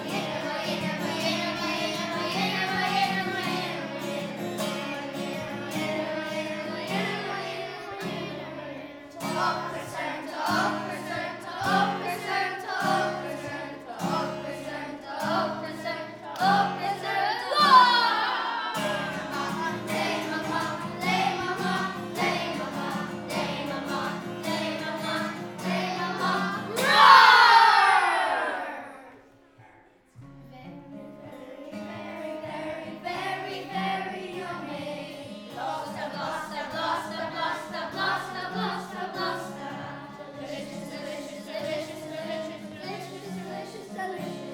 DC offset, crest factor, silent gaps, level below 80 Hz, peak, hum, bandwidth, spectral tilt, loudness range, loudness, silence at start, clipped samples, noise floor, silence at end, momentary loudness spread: under 0.1%; 26 dB; none; -68 dBFS; -2 dBFS; none; over 20 kHz; -4 dB/octave; 16 LU; -26 LUFS; 0 s; under 0.1%; -57 dBFS; 0 s; 14 LU